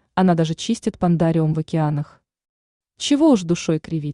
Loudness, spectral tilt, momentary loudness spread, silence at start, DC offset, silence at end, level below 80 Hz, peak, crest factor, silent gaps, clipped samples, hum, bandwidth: -20 LUFS; -6.5 dB/octave; 8 LU; 0.15 s; under 0.1%; 0 s; -52 dBFS; -6 dBFS; 14 dB; 2.49-2.80 s; under 0.1%; none; 11 kHz